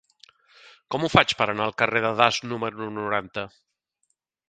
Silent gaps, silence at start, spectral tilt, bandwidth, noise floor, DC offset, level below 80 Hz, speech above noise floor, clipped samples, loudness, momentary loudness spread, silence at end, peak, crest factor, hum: none; 0.9 s; -4.5 dB/octave; 10 kHz; -75 dBFS; under 0.1%; -56 dBFS; 51 dB; under 0.1%; -23 LUFS; 13 LU; 1 s; 0 dBFS; 26 dB; none